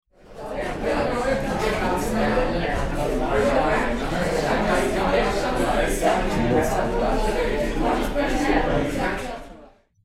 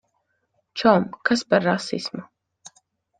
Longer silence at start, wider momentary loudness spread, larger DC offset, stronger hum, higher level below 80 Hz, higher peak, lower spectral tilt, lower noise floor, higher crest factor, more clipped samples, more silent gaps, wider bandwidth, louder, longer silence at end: second, 0.25 s vs 0.75 s; second, 5 LU vs 15 LU; neither; neither; first, -30 dBFS vs -64 dBFS; second, -8 dBFS vs -2 dBFS; about the same, -5.5 dB/octave vs -5 dB/octave; second, -49 dBFS vs -72 dBFS; second, 16 dB vs 22 dB; neither; neither; first, 15.5 kHz vs 9.4 kHz; about the same, -23 LUFS vs -21 LUFS; about the same, 0.4 s vs 0.5 s